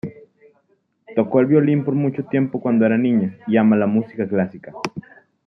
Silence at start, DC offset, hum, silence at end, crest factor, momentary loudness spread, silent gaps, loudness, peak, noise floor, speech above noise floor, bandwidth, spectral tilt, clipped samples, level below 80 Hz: 0.05 s; under 0.1%; none; 0.45 s; 16 dB; 14 LU; none; -19 LUFS; -4 dBFS; -64 dBFS; 46 dB; 6.4 kHz; -9 dB/octave; under 0.1%; -66 dBFS